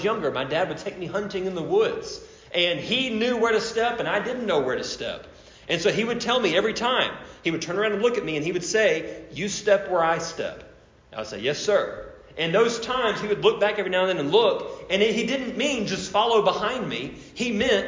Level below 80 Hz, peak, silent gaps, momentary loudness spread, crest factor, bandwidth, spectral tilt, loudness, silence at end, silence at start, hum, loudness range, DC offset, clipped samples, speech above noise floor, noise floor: -56 dBFS; -8 dBFS; none; 11 LU; 18 dB; 7.6 kHz; -3.5 dB/octave; -24 LUFS; 0 s; 0 s; none; 3 LU; under 0.1%; under 0.1%; 25 dB; -49 dBFS